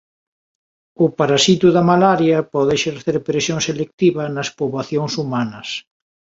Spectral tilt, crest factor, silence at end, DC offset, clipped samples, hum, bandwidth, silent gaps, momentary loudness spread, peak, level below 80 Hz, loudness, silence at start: -5 dB/octave; 16 dB; 0.6 s; under 0.1%; under 0.1%; none; 7.8 kHz; 3.93-3.98 s; 10 LU; -2 dBFS; -56 dBFS; -17 LUFS; 1 s